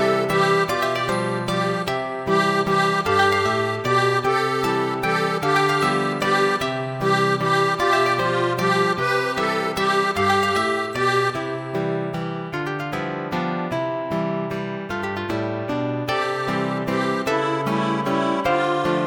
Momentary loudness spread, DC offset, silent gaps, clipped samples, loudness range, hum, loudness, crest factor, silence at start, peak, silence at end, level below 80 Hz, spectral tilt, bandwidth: 8 LU; under 0.1%; none; under 0.1%; 6 LU; none; -21 LUFS; 16 dB; 0 s; -6 dBFS; 0 s; -54 dBFS; -5 dB/octave; 17.5 kHz